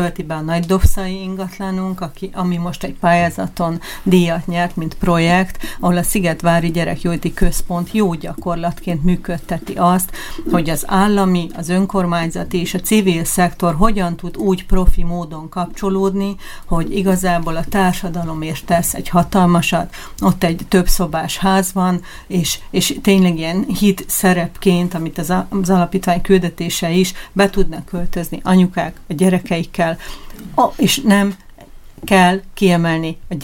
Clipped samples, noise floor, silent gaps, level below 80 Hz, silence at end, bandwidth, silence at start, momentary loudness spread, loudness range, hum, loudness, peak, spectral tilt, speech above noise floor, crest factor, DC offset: under 0.1%; -37 dBFS; none; -26 dBFS; 0 s; 17 kHz; 0 s; 10 LU; 3 LU; none; -17 LUFS; 0 dBFS; -5.5 dB/octave; 21 dB; 16 dB; under 0.1%